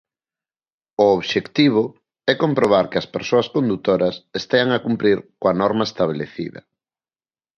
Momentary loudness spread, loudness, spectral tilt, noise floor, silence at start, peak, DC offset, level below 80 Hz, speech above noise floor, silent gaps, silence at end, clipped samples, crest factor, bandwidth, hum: 11 LU; -19 LUFS; -6 dB/octave; under -90 dBFS; 1 s; -2 dBFS; under 0.1%; -58 dBFS; over 71 dB; none; 1 s; under 0.1%; 18 dB; 7.6 kHz; none